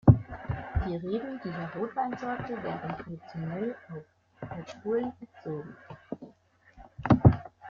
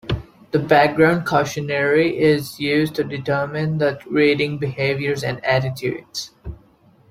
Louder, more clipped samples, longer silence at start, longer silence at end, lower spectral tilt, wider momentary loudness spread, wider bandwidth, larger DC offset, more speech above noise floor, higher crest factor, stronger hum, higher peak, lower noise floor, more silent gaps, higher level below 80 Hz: second, -31 LUFS vs -19 LUFS; neither; about the same, 0.05 s vs 0.05 s; second, 0 s vs 0.55 s; first, -10 dB/octave vs -6 dB/octave; first, 21 LU vs 13 LU; second, 6.8 kHz vs 16 kHz; neither; second, 26 dB vs 34 dB; first, 26 dB vs 18 dB; neither; about the same, -4 dBFS vs -2 dBFS; first, -60 dBFS vs -53 dBFS; neither; about the same, -44 dBFS vs -46 dBFS